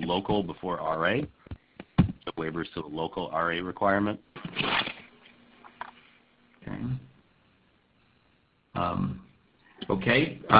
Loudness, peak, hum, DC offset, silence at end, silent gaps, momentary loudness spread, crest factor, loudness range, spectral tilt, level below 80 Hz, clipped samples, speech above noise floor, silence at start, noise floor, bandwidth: -29 LUFS; -4 dBFS; none; under 0.1%; 0 s; none; 19 LU; 26 dB; 13 LU; -10 dB/octave; -52 dBFS; under 0.1%; 39 dB; 0 s; -67 dBFS; 5.2 kHz